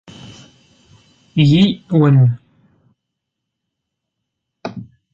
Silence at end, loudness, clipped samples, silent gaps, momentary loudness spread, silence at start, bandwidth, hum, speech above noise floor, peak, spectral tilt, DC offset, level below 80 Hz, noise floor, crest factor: 0.3 s; -14 LUFS; under 0.1%; none; 20 LU; 0.25 s; 7.4 kHz; none; 67 dB; -2 dBFS; -8 dB/octave; under 0.1%; -52 dBFS; -78 dBFS; 16 dB